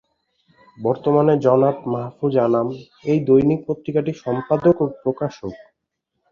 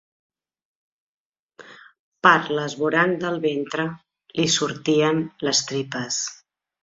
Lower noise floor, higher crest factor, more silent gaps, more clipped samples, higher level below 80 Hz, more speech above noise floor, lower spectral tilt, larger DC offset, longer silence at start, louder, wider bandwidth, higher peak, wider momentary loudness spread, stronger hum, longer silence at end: first, -77 dBFS vs -50 dBFS; second, 16 dB vs 22 dB; second, none vs 1.99-2.12 s; neither; first, -56 dBFS vs -66 dBFS; first, 58 dB vs 28 dB; first, -9.5 dB/octave vs -3.5 dB/octave; neither; second, 0.8 s vs 1.6 s; first, -19 LUFS vs -22 LUFS; second, 7 kHz vs 7.8 kHz; about the same, -4 dBFS vs -2 dBFS; about the same, 11 LU vs 10 LU; neither; first, 0.75 s vs 0.5 s